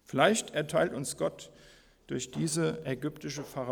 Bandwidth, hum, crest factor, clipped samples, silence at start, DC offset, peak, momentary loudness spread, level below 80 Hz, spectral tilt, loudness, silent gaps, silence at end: over 20 kHz; none; 22 dB; under 0.1%; 0.1 s; under 0.1%; -10 dBFS; 13 LU; -64 dBFS; -4.5 dB/octave; -32 LUFS; none; 0 s